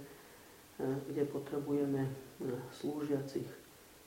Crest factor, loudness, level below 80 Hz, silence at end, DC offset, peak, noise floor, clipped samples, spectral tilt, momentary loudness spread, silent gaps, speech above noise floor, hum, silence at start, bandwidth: 16 dB; -39 LUFS; -72 dBFS; 0 s; under 0.1%; -24 dBFS; -58 dBFS; under 0.1%; -7 dB/octave; 19 LU; none; 20 dB; none; 0 s; 16.5 kHz